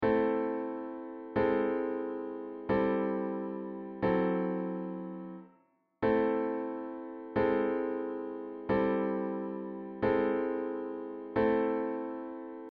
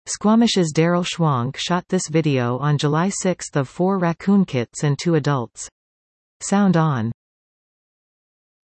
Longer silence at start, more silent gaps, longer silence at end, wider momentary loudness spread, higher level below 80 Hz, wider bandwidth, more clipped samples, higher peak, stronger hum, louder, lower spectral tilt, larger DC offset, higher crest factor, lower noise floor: about the same, 0 s vs 0.05 s; second, none vs 5.72-6.40 s; second, 0 s vs 1.5 s; first, 12 LU vs 8 LU; about the same, -60 dBFS vs -60 dBFS; second, 5 kHz vs 8.8 kHz; neither; second, -16 dBFS vs -4 dBFS; neither; second, -33 LUFS vs -20 LUFS; about the same, -6.5 dB/octave vs -5.5 dB/octave; neither; about the same, 16 dB vs 16 dB; second, -69 dBFS vs under -90 dBFS